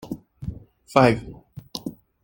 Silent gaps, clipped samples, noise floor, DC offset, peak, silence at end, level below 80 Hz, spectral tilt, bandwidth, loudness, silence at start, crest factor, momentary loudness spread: none; under 0.1%; -39 dBFS; under 0.1%; 0 dBFS; 0.3 s; -48 dBFS; -6.5 dB/octave; 17 kHz; -22 LUFS; 0.05 s; 24 dB; 21 LU